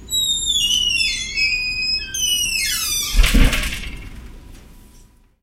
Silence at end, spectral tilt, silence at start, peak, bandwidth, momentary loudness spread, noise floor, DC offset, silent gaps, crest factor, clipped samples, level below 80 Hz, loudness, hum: 0.45 s; -1 dB/octave; 0 s; 0 dBFS; 16.5 kHz; 11 LU; -48 dBFS; under 0.1%; none; 20 dB; under 0.1%; -24 dBFS; -17 LUFS; none